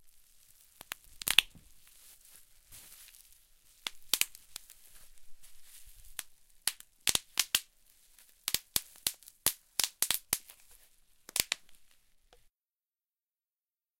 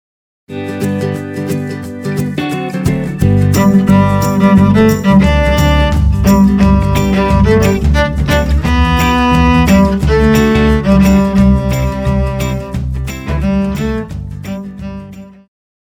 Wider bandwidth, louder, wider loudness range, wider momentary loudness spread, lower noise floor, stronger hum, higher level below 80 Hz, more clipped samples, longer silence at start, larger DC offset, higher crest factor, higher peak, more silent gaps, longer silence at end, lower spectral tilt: second, 17 kHz vs 19 kHz; second, -33 LUFS vs -11 LUFS; about the same, 6 LU vs 8 LU; first, 25 LU vs 13 LU; first, under -90 dBFS vs -31 dBFS; neither; second, -62 dBFS vs -18 dBFS; neither; second, 0.05 s vs 0.5 s; neither; first, 38 dB vs 12 dB; about the same, -2 dBFS vs 0 dBFS; neither; first, 2.25 s vs 0.65 s; second, 1.5 dB/octave vs -7 dB/octave